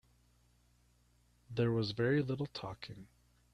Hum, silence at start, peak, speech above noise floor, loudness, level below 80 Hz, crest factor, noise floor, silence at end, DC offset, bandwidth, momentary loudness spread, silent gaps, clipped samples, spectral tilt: 60 Hz at -55 dBFS; 1.5 s; -20 dBFS; 35 dB; -36 LUFS; -66 dBFS; 18 dB; -71 dBFS; 0.5 s; under 0.1%; 10 kHz; 16 LU; none; under 0.1%; -7.5 dB/octave